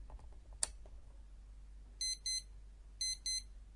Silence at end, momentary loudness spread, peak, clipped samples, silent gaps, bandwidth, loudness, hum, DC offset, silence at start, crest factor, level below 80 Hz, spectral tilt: 0 s; 22 LU; -14 dBFS; under 0.1%; none; 11.5 kHz; -40 LUFS; none; under 0.1%; 0 s; 32 dB; -54 dBFS; 0.5 dB/octave